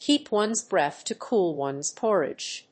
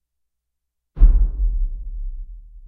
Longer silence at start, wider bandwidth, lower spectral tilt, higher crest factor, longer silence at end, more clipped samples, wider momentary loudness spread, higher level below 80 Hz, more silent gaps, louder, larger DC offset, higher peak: second, 0 s vs 0.95 s; first, 8.8 kHz vs 1.4 kHz; second, -3 dB/octave vs -12 dB/octave; about the same, 16 dB vs 18 dB; about the same, 0.1 s vs 0 s; neither; second, 6 LU vs 20 LU; second, -76 dBFS vs -20 dBFS; neither; second, -26 LUFS vs -22 LUFS; neither; second, -10 dBFS vs 0 dBFS